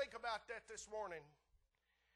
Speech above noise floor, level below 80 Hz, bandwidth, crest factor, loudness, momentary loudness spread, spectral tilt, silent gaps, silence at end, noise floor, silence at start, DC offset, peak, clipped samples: 33 dB; -76 dBFS; 11.5 kHz; 20 dB; -49 LUFS; 6 LU; -1.5 dB/octave; none; 0.85 s; -83 dBFS; 0 s; under 0.1%; -32 dBFS; under 0.1%